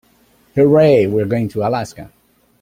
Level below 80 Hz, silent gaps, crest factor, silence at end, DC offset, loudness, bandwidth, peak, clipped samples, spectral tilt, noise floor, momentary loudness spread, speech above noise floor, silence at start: -50 dBFS; none; 14 dB; 0.55 s; under 0.1%; -15 LUFS; 15 kHz; -2 dBFS; under 0.1%; -8 dB/octave; -54 dBFS; 12 LU; 40 dB; 0.55 s